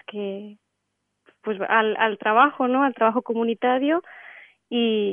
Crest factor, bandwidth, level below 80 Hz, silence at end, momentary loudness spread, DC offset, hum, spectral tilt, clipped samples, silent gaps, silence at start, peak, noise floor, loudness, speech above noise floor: 18 dB; 3.8 kHz; -82 dBFS; 0 s; 15 LU; under 0.1%; none; -8 dB/octave; under 0.1%; none; 0.1 s; -4 dBFS; -77 dBFS; -22 LUFS; 55 dB